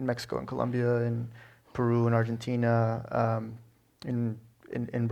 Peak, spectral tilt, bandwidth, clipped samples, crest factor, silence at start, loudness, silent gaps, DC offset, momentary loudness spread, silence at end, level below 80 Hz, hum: -12 dBFS; -8 dB/octave; 9.2 kHz; under 0.1%; 18 dB; 0 s; -30 LUFS; none; under 0.1%; 15 LU; 0 s; -62 dBFS; none